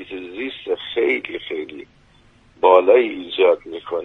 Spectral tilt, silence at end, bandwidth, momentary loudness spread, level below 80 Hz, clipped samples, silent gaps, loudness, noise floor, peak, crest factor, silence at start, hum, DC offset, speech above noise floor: -5.5 dB/octave; 0 s; 4.2 kHz; 16 LU; -60 dBFS; under 0.1%; none; -19 LUFS; -53 dBFS; 0 dBFS; 18 dB; 0 s; none; under 0.1%; 35 dB